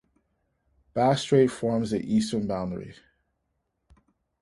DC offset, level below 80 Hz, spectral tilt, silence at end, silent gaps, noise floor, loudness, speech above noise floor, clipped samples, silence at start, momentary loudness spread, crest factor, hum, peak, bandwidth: under 0.1%; -58 dBFS; -6.5 dB/octave; 1.5 s; none; -77 dBFS; -25 LUFS; 53 dB; under 0.1%; 0.95 s; 13 LU; 20 dB; none; -8 dBFS; 11.5 kHz